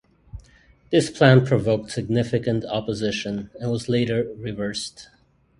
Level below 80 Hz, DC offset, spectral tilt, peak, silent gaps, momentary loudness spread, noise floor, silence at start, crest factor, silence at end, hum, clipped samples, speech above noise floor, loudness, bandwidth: -50 dBFS; under 0.1%; -6 dB/octave; 0 dBFS; none; 13 LU; -54 dBFS; 0.35 s; 22 dB; 0.55 s; none; under 0.1%; 33 dB; -22 LUFS; 11.5 kHz